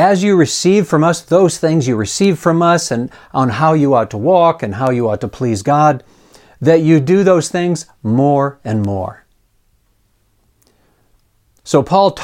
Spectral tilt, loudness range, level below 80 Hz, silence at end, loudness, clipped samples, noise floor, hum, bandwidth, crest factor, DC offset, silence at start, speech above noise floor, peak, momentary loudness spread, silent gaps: -6 dB/octave; 7 LU; -50 dBFS; 0 s; -14 LUFS; under 0.1%; -58 dBFS; none; 16 kHz; 14 dB; under 0.1%; 0 s; 45 dB; 0 dBFS; 8 LU; none